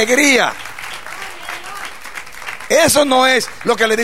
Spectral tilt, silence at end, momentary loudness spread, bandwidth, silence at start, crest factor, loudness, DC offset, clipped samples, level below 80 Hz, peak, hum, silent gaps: -2 dB/octave; 0 s; 17 LU; 16 kHz; 0 s; 16 dB; -13 LUFS; 2%; under 0.1%; -52 dBFS; 0 dBFS; none; none